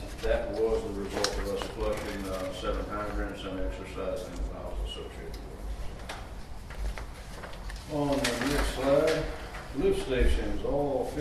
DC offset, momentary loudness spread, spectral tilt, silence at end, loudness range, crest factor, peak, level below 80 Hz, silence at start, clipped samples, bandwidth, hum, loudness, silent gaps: under 0.1%; 14 LU; -5 dB/octave; 0 s; 11 LU; 22 dB; -10 dBFS; -36 dBFS; 0 s; under 0.1%; 13.5 kHz; none; -32 LUFS; none